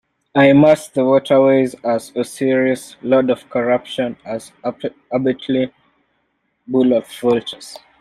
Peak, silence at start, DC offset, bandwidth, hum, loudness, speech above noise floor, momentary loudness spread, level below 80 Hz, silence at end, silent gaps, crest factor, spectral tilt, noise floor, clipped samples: 0 dBFS; 0.35 s; under 0.1%; 13.5 kHz; none; -17 LUFS; 51 dB; 14 LU; -56 dBFS; 0.25 s; none; 16 dB; -6 dB/octave; -67 dBFS; under 0.1%